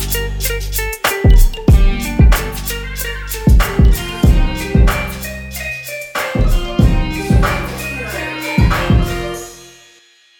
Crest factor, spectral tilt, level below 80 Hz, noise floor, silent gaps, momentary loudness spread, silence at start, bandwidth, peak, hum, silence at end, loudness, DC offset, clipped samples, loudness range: 12 dB; -5.5 dB/octave; -16 dBFS; -48 dBFS; none; 10 LU; 0 s; 19 kHz; 0 dBFS; none; 0.75 s; -16 LUFS; under 0.1%; under 0.1%; 3 LU